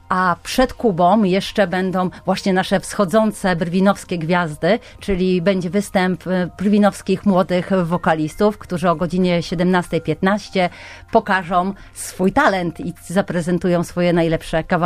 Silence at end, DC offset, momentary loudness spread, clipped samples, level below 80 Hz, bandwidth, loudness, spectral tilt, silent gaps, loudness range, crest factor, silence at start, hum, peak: 0 s; under 0.1%; 5 LU; under 0.1%; -40 dBFS; 15 kHz; -18 LUFS; -6 dB/octave; none; 2 LU; 16 dB; 0.1 s; none; -2 dBFS